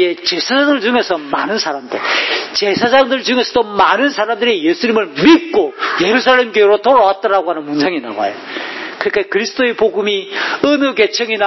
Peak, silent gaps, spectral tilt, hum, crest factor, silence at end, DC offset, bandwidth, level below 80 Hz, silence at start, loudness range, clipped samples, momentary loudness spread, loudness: 0 dBFS; none; -3.5 dB/octave; none; 14 dB; 0 s; under 0.1%; 6.2 kHz; -54 dBFS; 0 s; 4 LU; under 0.1%; 9 LU; -13 LUFS